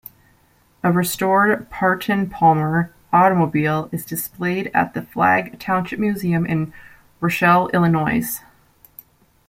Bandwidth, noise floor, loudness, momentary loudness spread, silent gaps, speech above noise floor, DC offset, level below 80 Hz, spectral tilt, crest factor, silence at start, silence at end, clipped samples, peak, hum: 16.5 kHz; -57 dBFS; -19 LUFS; 9 LU; none; 39 dB; under 0.1%; -52 dBFS; -6 dB/octave; 18 dB; 0.85 s; 1.1 s; under 0.1%; -2 dBFS; none